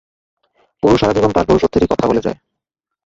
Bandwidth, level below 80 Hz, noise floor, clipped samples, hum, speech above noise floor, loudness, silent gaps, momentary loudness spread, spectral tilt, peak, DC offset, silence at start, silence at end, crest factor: 7.8 kHz; -36 dBFS; -80 dBFS; under 0.1%; none; 67 dB; -15 LUFS; none; 7 LU; -7 dB/octave; -2 dBFS; under 0.1%; 0.85 s; 0.7 s; 16 dB